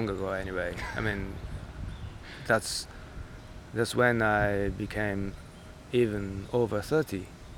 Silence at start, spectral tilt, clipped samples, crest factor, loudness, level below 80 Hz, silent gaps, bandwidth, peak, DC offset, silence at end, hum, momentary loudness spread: 0 s; -5.5 dB/octave; under 0.1%; 20 dB; -30 LUFS; -46 dBFS; none; 18 kHz; -10 dBFS; under 0.1%; 0 s; none; 19 LU